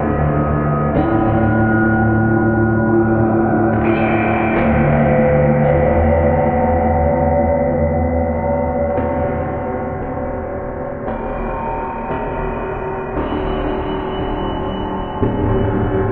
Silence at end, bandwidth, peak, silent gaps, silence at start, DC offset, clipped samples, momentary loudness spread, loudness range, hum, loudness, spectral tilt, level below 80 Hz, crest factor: 0 s; 4 kHz; -2 dBFS; none; 0 s; under 0.1%; under 0.1%; 9 LU; 8 LU; none; -17 LUFS; -11.5 dB/octave; -28 dBFS; 14 dB